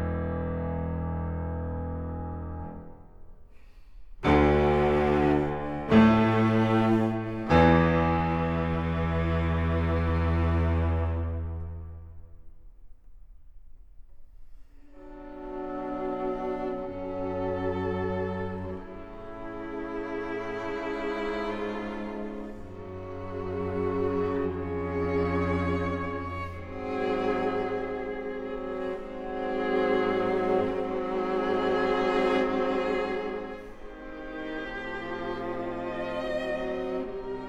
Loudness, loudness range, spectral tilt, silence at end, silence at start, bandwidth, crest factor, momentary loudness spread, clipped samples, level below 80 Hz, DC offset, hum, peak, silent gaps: -28 LUFS; 12 LU; -8.5 dB/octave; 0 s; 0 s; 8 kHz; 20 dB; 15 LU; under 0.1%; -40 dBFS; under 0.1%; none; -8 dBFS; none